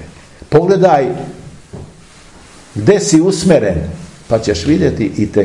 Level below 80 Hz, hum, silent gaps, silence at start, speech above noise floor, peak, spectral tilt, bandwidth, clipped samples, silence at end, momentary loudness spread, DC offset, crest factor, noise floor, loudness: -38 dBFS; none; none; 0 s; 28 dB; 0 dBFS; -6 dB/octave; 11.5 kHz; under 0.1%; 0 s; 21 LU; 0.3%; 14 dB; -39 dBFS; -12 LUFS